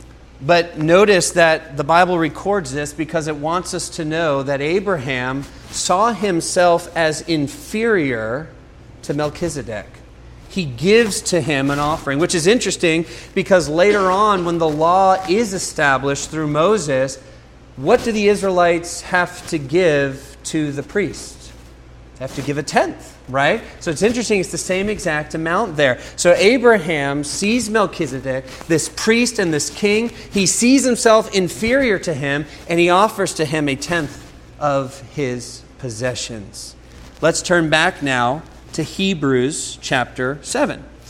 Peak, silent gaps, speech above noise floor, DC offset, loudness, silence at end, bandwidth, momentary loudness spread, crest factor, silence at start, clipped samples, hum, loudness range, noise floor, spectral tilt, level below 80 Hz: 0 dBFS; none; 24 dB; under 0.1%; -17 LUFS; 0 s; 16 kHz; 12 LU; 18 dB; 0 s; under 0.1%; none; 6 LU; -42 dBFS; -4 dB/octave; -44 dBFS